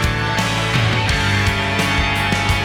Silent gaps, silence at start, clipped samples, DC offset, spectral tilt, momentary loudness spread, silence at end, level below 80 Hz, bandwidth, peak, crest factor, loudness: none; 0 s; under 0.1%; under 0.1%; -4.5 dB/octave; 2 LU; 0 s; -28 dBFS; 18 kHz; -8 dBFS; 10 dB; -17 LUFS